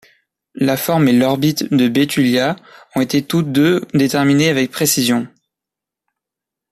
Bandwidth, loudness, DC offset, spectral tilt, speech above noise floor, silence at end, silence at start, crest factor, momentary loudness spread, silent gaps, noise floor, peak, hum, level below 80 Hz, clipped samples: 15 kHz; -15 LUFS; under 0.1%; -5 dB/octave; 70 dB; 1.45 s; 0.55 s; 14 dB; 7 LU; none; -85 dBFS; -2 dBFS; none; -56 dBFS; under 0.1%